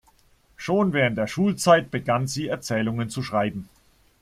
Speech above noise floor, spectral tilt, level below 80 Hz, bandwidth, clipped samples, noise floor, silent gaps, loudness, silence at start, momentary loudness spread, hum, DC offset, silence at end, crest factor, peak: 36 dB; -5.5 dB/octave; -56 dBFS; 15 kHz; under 0.1%; -59 dBFS; none; -23 LUFS; 0.6 s; 10 LU; none; under 0.1%; 0.55 s; 20 dB; -4 dBFS